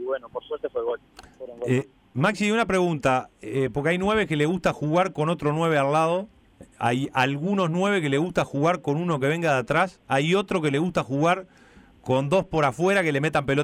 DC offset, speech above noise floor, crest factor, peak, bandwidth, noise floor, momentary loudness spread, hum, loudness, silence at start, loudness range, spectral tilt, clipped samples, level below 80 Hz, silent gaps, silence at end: under 0.1%; 20 dB; 14 dB; -10 dBFS; 15 kHz; -44 dBFS; 9 LU; none; -24 LUFS; 0 s; 2 LU; -6 dB/octave; under 0.1%; -54 dBFS; none; 0 s